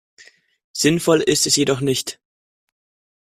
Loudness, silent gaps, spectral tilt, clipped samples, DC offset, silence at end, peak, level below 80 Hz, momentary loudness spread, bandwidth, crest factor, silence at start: -17 LUFS; none; -3.5 dB/octave; under 0.1%; under 0.1%; 1.15 s; -2 dBFS; -58 dBFS; 11 LU; 16 kHz; 18 dB; 0.75 s